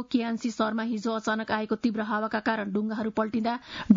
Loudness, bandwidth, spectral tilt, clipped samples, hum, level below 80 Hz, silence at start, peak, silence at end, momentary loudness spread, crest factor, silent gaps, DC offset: -29 LUFS; 7.6 kHz; -6 dB/octave; under 0.1%; none; -64 dBFS; 0 s; -6 dBFS; 0 s; 2 LU; 22 dB; none; under 0.1%